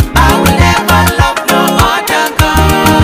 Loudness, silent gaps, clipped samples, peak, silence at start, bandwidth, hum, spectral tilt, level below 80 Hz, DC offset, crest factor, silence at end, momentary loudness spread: -8 LUFS; none; 0.9%; 0 dBFS; 0 s; 16.5 kHz; none; -4.5 dB/octave; -18 dBFS; under 0.1%; 8 dB; 0 s; 3 LU